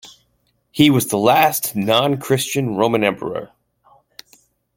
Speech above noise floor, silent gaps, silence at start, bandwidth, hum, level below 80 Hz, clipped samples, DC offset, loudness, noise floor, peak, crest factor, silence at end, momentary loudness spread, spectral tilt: 48 dB; none; 0.05 s; 17 kHz; none; -56 dBFS; under 0.1%; under 0.1%; -17 LUFS; -65 dBFS; 0 dBFS; 18 dB; 1.3 s; 13 LU; -4.5 dB/octave